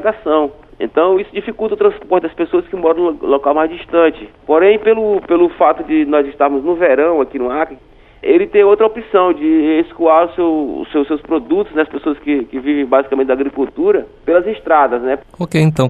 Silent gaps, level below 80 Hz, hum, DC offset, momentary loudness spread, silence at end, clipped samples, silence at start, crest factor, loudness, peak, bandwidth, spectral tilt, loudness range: none; -46 dBFS; none; under 0.1%; 7 LU; 0 s; under 0.1%; 0 s; 14 dB; -14 LUFS; 0 dBFS; 9.8 kHz; -8 dB/octave; 3 LU